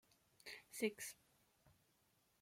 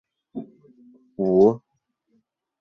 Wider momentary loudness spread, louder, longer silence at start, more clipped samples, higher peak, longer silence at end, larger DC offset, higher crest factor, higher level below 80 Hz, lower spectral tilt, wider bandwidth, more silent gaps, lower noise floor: second, 16 LU vs 21 LU; second, -48 LUFS vs -20 LUFS; about the same, 0.45 s vs 0.35 s; neither; second, -28 dBFS vs -6 dBFS; second, 0.7 s vs 1.05 s; neither; about the same, 24 dB vs 20 dB; second, -88 dBFS vs -62 dBFS; second, -3 dB/octave vs -10.5 dB/octave; first, 16.5 kHz vs 6.2 kHz; neither; first, -80 dBFS vs -73 dBFS